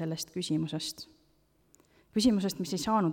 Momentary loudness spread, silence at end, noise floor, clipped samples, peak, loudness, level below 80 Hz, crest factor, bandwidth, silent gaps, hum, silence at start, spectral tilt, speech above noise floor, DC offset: 11 LU; 0 s; -69 dBFS; under 0.1%; -14 dBFS; -31 LUFS; -60 dBFS; 18 dB; 18 kHz; none; none; 0 s; -5 dB/octave; 38 dB; under 0.1%